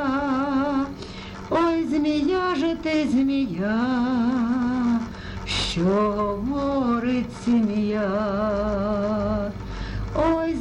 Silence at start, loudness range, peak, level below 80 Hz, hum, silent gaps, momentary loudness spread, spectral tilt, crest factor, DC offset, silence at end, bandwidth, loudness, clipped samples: 0 s; 1 LU; -10 dBFS; -40 dBFS; none; none; 7 LU; -6.5 dB/octave; 12 dB; under 0.1%; 0 s; 10.5 kHz; -23 LUFS; under 0.1%